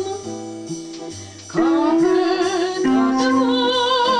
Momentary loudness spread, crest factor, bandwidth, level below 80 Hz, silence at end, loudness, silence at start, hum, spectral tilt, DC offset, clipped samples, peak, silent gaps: 15 LU; 12 dB; 10.5 kHz; -58 dBFS; 0 s; -18 LUFS; 0 s; none; -4 dB/octave; under 0.1%; under 0.1%; -8 dBFS; none